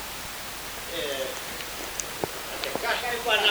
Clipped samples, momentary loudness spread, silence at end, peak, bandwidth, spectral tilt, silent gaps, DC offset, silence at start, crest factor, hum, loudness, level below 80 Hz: under 0.1%; 8 LU; 0 s; -8 dBFS; over 20 kHz; -1 dB/octave; none; under 0.1%; 0 s; 22 dB; none; -29 LUFS; -52 dBFS